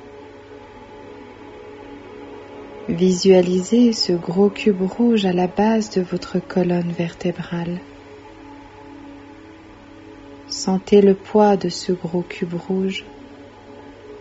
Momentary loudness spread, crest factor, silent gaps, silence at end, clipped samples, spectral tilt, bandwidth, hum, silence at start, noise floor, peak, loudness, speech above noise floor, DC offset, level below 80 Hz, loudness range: 25 LU; 20 dB; none; 0 s; under 0.1%; -6 dB/octave; 8 kHz; none; 0 s; -42 dBFS; -2 dBFS; -19 LUFS; 24 dB; under 0.1%; -54 dBFS; 13 LU